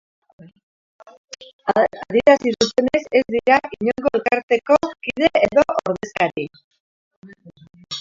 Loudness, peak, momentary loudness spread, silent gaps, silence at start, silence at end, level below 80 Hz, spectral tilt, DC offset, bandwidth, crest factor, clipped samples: -18 LUFS; 0 dBFS; 13 LU; 1.53-1.59 s, 4.43-4.48 s, 6.64-6.71 s, 6.80-7.22 s; 1.3 s; 0 s; -54 dBFS; -4.5 dB/octave; under 0.1%; 7.6 kHz; 20 dB; under 0.1%